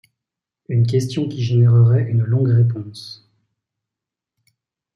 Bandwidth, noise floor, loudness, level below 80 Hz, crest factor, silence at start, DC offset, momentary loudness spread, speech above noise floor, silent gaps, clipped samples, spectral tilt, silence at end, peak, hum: 7 kHz; -86 dBFS; -17 LUFS; -62 dBFS; 14 dB; 0.7 s; under 0.1%; 17 LU; 70 dB; none; under 0.1%; -8 dB/octave; 1.8 s; -6 dBFS; none